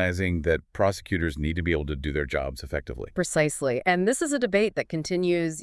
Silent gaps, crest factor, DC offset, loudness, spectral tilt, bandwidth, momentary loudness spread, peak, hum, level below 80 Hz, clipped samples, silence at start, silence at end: none; 18 dB; under 0.1%; -26 LUFS; -5 dB/octave; 12 kHz; 7 LU; -8 dBFS; none; -42 dBFS; under 0.1%; 0 s; 0 s